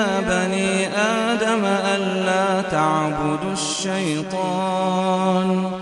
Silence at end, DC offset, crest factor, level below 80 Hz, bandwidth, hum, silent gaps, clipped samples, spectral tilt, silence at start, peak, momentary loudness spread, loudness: 0 s; under 0.1%; 16 dB; -50 dBFS; 11.5 kHz; none; none; under 0.1%; -4.5 dB/octave; 0 s; -6 dBFS; 4 LU; -20 LUFS